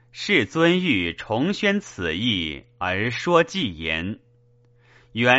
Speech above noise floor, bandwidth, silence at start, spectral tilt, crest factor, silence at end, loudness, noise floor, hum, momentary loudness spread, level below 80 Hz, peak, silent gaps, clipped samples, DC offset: 35 dB; 8 kHz; 0.15 s; -3 dB/octave; 22 dB; 0 s; -22 LUFS; -57 dBFS; none; 10 LU; -50 dBFS; -2 dBFS; none; under 0.1%; under 0.1%